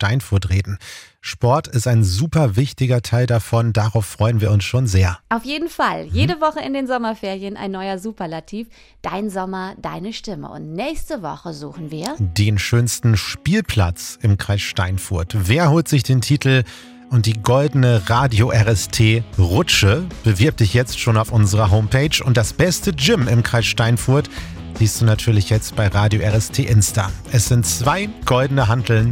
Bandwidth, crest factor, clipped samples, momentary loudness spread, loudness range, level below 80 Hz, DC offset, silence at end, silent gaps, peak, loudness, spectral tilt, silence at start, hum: 17 kHz; 16 dB; under 0.1%; 12 LU; 9 LU; -38 dBFS; under 0.1%; 0 s; none; -2 dBFS; -18 LUFS; -5 dB/octave; 0 s; none